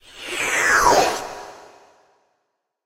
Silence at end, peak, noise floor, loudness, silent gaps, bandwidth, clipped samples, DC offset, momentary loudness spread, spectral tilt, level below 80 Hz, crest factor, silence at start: 1.25 s; -2 dBFS; -75 dBFS; -18 LUFS; none; 16 kHz; under 0.1%; under 0.1%; 21 LU; -1.5 dB/octave; -48 dBFS; 20 dB; 0.15 s